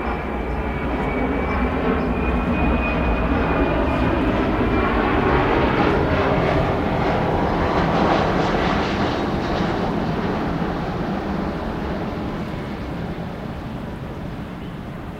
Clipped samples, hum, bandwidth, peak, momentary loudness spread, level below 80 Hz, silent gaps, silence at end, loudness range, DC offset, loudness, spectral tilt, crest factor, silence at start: under 0.1%; none; 13.5 kHz; -6 dBFS; 12 LU; -30 dBFS; none; 0 s; 8 LU; under 0.1%; -21 LUFS; -7.5 dB/octave; 16 dB; 0 s